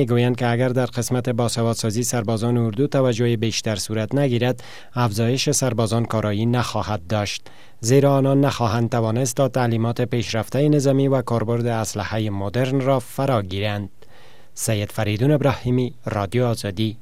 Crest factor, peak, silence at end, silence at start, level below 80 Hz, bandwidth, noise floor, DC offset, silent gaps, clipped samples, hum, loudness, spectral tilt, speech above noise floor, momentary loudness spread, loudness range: 18 dB; -4 dBFS; 0.05 s; 0 s; -52 dBFS; 15.5 kHz; -50 dBFS; 1%; none; under 0.1%; none; -21 LUFS; -5.5 dB/octave; 30 dB; 6 LU; 3 LU